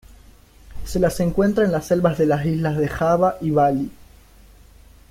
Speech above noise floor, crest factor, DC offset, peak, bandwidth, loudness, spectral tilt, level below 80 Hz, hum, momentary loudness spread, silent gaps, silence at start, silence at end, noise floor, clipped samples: 29 dB; 16 dB; under 0.1%; -6 dBFS; 16 kHz; -20 LUFS; -7 dB/octave; -40 dBFS; none; 7 LU; none; 0.7 s; 1.2 s; -48 dBFS; under 0.1%